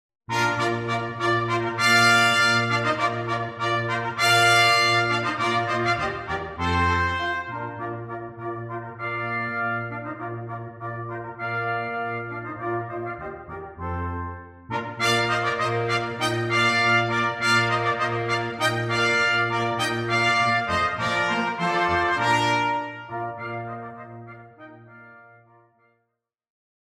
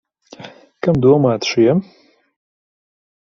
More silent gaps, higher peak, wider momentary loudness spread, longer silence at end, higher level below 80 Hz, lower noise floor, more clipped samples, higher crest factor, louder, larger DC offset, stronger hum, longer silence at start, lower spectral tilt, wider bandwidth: neither; second, -6 dBFS vs -2 dBFS; second, 15 LU vs 19 LU; first, 1.7 s vs 1.5 s; about the same, -52 dBFS vs -50 dBFS; first, -78 dBFS vs -39 dBFS; neither; about the same, 18 dB vs 18 dB; second, -23 LUFS vs -15 LUFS; neither; neither; about the same, 0.3 s vs 0.4 s; second, -4 dB/octave vs -6.5 dB/octave; first, 16 kHz vs 7.4 kHz